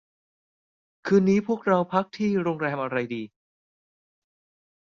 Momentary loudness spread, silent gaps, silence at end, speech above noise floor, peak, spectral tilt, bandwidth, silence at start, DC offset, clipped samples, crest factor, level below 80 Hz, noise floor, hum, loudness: 13 LU; none; 1.7 s; over 66 dB; -8 dBFS; -7.5 dB/octave; 7.2 kHz; 1.05 s; under 0.1%; under 0.1%; 20 dB; -68 dBFS; under -90 dBFS; none; -24 LUFS